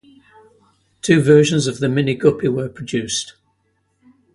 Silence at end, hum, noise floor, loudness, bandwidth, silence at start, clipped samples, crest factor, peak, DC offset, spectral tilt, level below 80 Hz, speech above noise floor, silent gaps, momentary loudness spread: 1.05 s; none; -66 dBFS; -17 LUFS; 11.5 kHz; 1.05 s; under 0.1%; 18 dB; 0 dBFS; under 0.1%; -5.5 dB/octave; -54 dBFS; 49 dB; none; 12 LU